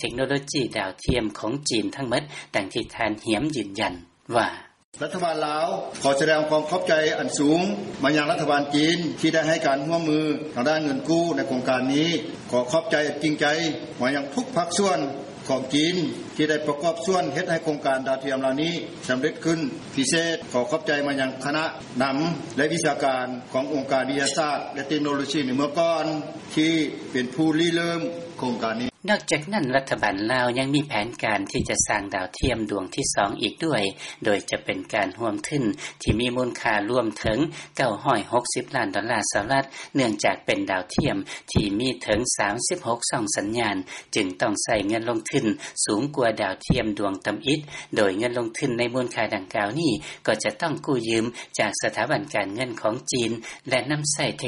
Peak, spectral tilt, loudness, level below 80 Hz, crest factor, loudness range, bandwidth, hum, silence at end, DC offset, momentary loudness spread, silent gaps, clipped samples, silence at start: -6 dBFS; -4 dB/octave; -24 LUFS; -48 dBFS; 18 dB; 3 LU; 11.5 kHz; none; 0 s; under 0.1%; 6 LU; 4.84-4.92 s; under 0.1%; 0 s